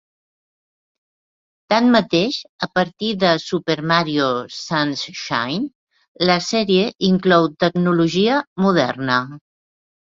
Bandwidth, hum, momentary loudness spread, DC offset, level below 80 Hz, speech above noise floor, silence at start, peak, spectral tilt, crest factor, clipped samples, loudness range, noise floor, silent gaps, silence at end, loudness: 7.6 kHz; none; 8 LU; under 0.1%; -58 dBFS; over 72 dB; 1.7 s; -2 dBFS; -5.5 dB/octave; 18 dB; under 0.1%; 3 LU; under -90 dBFS; 2.49-2.59 s, 5.75-5.87 s, 6.08-6.15 s, 6.95-6.99 s, 8.47-8.56 s; 0.7 s; -18 LUFS